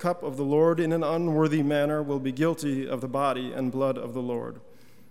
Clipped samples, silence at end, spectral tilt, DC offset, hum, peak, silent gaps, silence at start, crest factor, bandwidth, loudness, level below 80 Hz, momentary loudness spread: under 0.1%; 0.5 s; -7 dB/octave; 0.4%; none; -12 dBFS; none; 0 s; 16 dB; 15.5 kHz; -27 LUFS; -70 dBFS; 8 LU